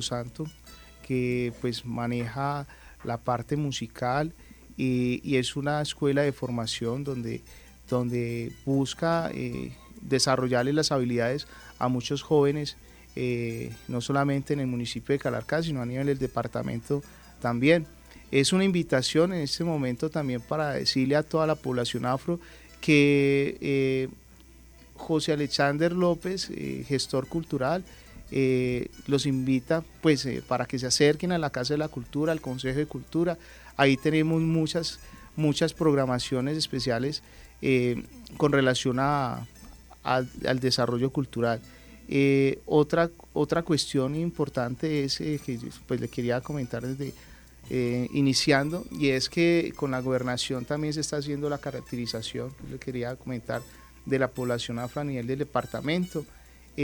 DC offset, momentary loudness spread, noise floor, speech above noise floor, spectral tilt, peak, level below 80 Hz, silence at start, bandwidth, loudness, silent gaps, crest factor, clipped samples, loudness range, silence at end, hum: under 0.1%; 11 LU; -52 dBFS; 25 dB; -5.5 dB/octave; -6 dBFS; -54 dBFS; 0 s; over 20 kHz; -27 LUFS; none; 22 dB; under 0.1%; 5 LU; 0 s; none